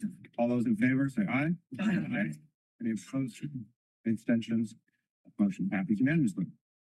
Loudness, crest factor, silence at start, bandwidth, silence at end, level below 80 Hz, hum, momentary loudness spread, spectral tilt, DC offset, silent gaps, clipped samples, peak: -32 LUFS; 16 dB; 0 s; 12 kHz; 0.35 s; -70 dBFS; none; 12 LU; -7.5 dB/octave; under 0.1%; 2.54-2.79 s, 3.76-4.04 s, 5.10-5.24 s; under 0.1%; -16 dBFS